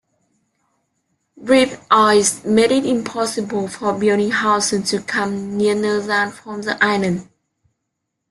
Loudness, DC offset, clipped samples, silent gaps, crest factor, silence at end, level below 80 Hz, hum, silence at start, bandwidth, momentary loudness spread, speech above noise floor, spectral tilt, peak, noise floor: -17 LUFS; under 0.1%; under 0.1%; none; 18 dB; 1.05 s; -60 dBFS; none; 1.35 s; 12.5 kHz; 8 LU; 59 dB; -3.5 dB/octave; -2 dBFS; -77 dBFS